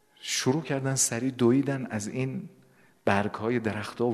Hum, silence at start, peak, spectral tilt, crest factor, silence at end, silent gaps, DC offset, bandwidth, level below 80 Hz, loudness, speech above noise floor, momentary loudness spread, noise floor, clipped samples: none; 0.2 s; -6 dBFS; -4.5 dB/octave; 22 dB; 0 s; none; under 0.1%; 13.5 kHz; -66 dBFS; -28 LUFS; 33 dB; 9 LU; -60 dBFS; under 0.1%